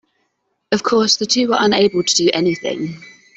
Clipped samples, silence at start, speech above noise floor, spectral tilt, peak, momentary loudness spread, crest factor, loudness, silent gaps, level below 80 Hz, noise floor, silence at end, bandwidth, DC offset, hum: under 0.1%; 0.7 s; 53 dB; -3 dB/octave; -2 dBFS; 10 LU; 16 dB; -16 LUFS; none; -58 dBFS; -69 dBFS; 0.3 s; 8.4 kHz; under 0.1%; none